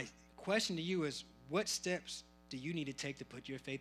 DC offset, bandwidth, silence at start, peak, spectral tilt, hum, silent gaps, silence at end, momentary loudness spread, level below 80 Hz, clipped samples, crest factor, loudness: under 0.1%; 15.5 kHz; 0 s; -20 dBFS; -3.5 dB/octave; none; none; 0 s; 13 LU; -70 dBFS; under 0.1%; 20 dB; -40 LUFS